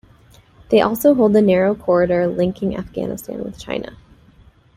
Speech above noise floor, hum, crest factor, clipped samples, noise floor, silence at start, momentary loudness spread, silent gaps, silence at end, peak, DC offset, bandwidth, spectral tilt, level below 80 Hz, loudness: 32 dB; none; 16 dB; under 0.1%; -49 dBFS; 0.7 s; 14 LU; none; 0.8 s; -2 dBFS; under 0.1%; 16 kHz; -6.5 dB/octave; -48 dBFS; -17 LUFS